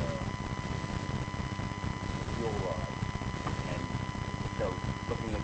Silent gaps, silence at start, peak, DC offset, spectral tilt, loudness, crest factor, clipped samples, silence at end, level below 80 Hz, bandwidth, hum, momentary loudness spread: none; 0 s; -20 dBFS; under 0.1%; -6 dB/octave; -36 LUFS; 14 dB; under 0.1%; 0 s; -44 dBFS; 8.4 kHz; none; 2 LU